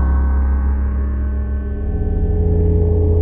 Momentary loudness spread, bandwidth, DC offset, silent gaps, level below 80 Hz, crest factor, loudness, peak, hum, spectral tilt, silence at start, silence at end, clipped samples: 6 LU; 2.3 kHz; under 0.1%; none; -18 dBFS; 10 dB; -18 LUFS; -4 dBFS; none; -14 dB/octave; 0 s; 0 s; under 0.1%